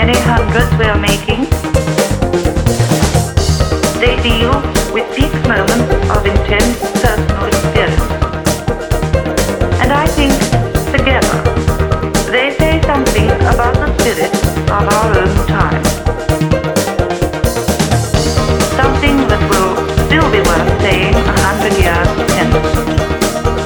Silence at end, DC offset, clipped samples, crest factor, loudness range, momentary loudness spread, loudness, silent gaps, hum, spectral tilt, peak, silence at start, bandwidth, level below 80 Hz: 0 s; under 0.1%; under 0.1%; 12 dB; 2 LU; 4 LU; -12 LUFS; none; none; -5 dB/octave; 0 dBFS; 0 s; over 20 kHz; -20 dBFS